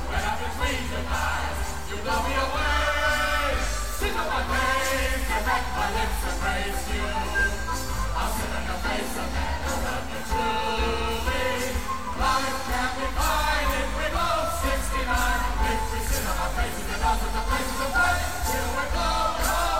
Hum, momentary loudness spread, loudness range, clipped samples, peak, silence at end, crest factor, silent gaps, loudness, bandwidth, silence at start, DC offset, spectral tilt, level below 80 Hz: none; 6 LU; 3 LU; under 0.1%; -10 dBFS; 0 s; 16 dB; none; -26 LUFS; 16.5 kHz; 0 s; 2%; -3.5 dB/octave; -30 dBFS